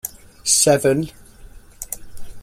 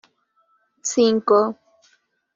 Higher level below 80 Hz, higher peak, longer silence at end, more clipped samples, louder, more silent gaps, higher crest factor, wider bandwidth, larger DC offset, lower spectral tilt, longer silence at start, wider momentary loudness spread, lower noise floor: first, -44 dBFS vs -70 dBFS; about the same, -2 dBFS vs -4 dBFS; second, 0 s vs 0.8 s; neither; first, -16 LUFS vs -19 LUFS; neither; about the same, 20 dB vs 18 dB; first, 16.5 kHz vs 7.6 kHz; neither; about the same, -3 dB/octave vs -4 dB/octave; second, 0.05 s vs 0.85 s; first, 19 LU vs 13 LU; second, -42 dBFS vs -65 dBFS